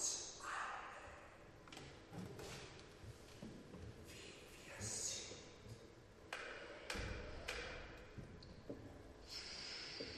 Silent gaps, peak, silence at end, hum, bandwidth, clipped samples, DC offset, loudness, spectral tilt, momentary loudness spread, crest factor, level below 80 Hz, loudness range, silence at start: none; -28 dBFS; 0 s; none; 13 kHz; under 0.1%; under 0.1%; -51 LUFS; -2 dB/octave; 12 LU; 22 dB; -62 dBFS; 7 LU; 0 s